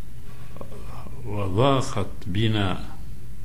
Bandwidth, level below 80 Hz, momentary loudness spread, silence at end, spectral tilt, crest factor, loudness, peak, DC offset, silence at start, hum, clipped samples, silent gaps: 15.5 kHz; -42 dBFS; 21 LU; 0 s; -6.5 dB/octave; 18 dB; -25 LUFS; -8 dBFS; 5%; 0 s; none; under 0.1%; none